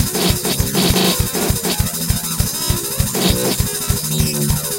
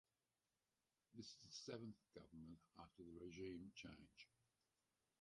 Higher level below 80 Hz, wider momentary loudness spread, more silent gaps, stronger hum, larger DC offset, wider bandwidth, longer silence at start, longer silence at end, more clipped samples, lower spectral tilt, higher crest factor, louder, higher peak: first, -28 dBFS vs -80 dBFS; second, 4 LU vs 12 LU; neither; neither; neither; first, 16 kHz vs 11 kHz; second, 0 s vs 1.1 s; second, 0 s vs 0.95 s; neither; about the same, -3.5 dB/octave vs -4.5 dB/octave; about the same, 16 dB vs 20 dB; first, -17 LUFS vs -59 LUFS; first, 0 dBFS vs -40 dBFS